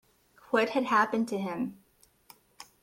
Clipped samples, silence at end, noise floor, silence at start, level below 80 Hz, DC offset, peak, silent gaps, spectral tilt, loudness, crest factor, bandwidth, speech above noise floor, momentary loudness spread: under 0.1%; 0.2 s; -60 dBFS; 0.5 s; -72 dBFS; under 0.1%; -12 dBFS; none; -5 dB/octave; -29 LUFS; 20 dB; 16.5 kHz; 32 dB; 11 LU